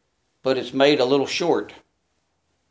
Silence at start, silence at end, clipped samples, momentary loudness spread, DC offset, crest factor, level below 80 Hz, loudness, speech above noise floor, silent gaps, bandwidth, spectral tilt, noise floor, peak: 0.45 s; 0.95 s; under 0.1%; 10 LU; under 0.1%; 20 dB; -68 dBFS; -21 LUFS; 51 dB; none; 8 kHz; -4.5 dB/octave; -71 dBFS; -4 dBFS